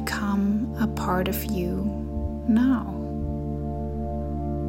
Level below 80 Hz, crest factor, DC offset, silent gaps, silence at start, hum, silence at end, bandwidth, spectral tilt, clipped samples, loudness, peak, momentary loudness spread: -34 dBFS; 14 dB; under 0.1%; none; 0 s; none; 0 s; 16 kHz; -7 dB/octave; under 0.1%; -26 LUFS; -12 dBFS; 9 LU